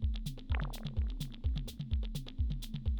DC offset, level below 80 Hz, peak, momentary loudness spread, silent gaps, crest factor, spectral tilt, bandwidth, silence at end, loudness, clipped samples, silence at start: under 0.1%; -38 dBFS; -20 dBFS; 2 LU; none; 16 dB; -6 dB/octave; over 20 kHz; 0 s; -39 LUFS; under 0.1%; 0 s